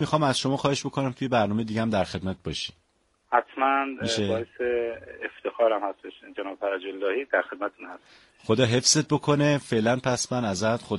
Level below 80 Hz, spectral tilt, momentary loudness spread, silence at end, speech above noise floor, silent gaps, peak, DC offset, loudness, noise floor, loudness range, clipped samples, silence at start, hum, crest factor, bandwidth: -58 dBFS; -4.5 dB/octave; 12 LU; 0 s; 40 dB; none; -6 dBFS; under 0.1%; -26 LUFS; -66 dBFS; 5 LU; under 0.1%; 0 s; none; 20 dB; 11.5 kHz